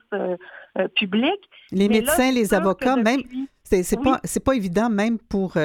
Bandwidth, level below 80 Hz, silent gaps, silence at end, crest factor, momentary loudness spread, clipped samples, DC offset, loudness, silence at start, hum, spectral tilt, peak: 18.5 kHz; -44 dBFS; none; 0 s; 18 dB; 10 LU; under 0.1%; under 0.1%; -21 LUFS; 0.1 s; none; -5 dB/octave; -4 dBFS